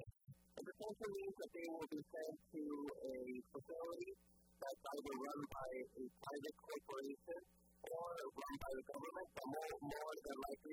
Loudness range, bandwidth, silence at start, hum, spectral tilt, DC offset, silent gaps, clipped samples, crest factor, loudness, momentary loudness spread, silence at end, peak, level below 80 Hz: 1 LU; over 20 kHz; 0 s; none; -5 dB/octave; under 0.1%; none; under 0.1%; 14 dB; -51 LUFS; 6 LU; 0 s; -36 dBFS; -74 dBFS